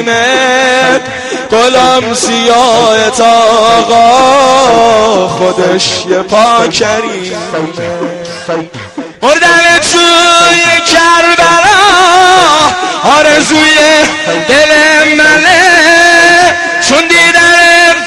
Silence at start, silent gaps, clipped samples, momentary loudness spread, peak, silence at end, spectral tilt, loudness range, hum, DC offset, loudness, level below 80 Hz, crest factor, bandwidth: 0 s; none; 2%; 13 LU; 0 dBFS; 0 s; -2 dB/octave; 6 LU; none; under 0.1%; -5 LUFS; -40 dBFS; 6 dB; 17 kHz